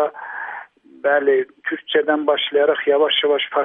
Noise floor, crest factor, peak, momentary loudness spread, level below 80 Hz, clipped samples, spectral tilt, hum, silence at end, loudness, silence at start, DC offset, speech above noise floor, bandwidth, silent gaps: -39 dBFS; 16 dB; -4 dBFS; 13 LU; -78 dBFS; under 0.1%; -6 dB/octave; none; 0 s; -18 LUFS; 0 s; under 0.1%; 21 dB; 3.9 kHz; none